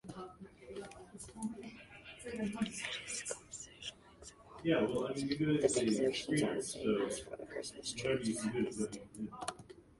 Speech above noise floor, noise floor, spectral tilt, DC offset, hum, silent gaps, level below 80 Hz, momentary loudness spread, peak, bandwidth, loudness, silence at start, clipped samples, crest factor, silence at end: 22 dB; -58 dBFS; -4.5 dB/octave; under 0.1%; none; none; -66 dBFS; 19 LU; -18 dBFS; 11.5 kHz; -37 LUFS; 0.05 s; under 0.1%; 22 dB; 0.2 s